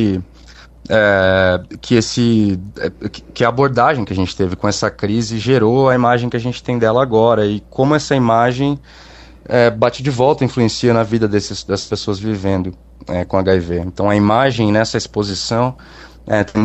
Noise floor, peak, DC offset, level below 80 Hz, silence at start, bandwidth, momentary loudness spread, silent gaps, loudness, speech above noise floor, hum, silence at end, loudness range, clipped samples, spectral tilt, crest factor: -40 dBFS; 0 dBFS; under 0.1%; -42 dBFS; 0 s; 8.4 kHz; 9 LU; none; -15 LUFS; 25 dB; none; 0 s; 3 LU; under 0.1%; -6 dB/octave; 16 dB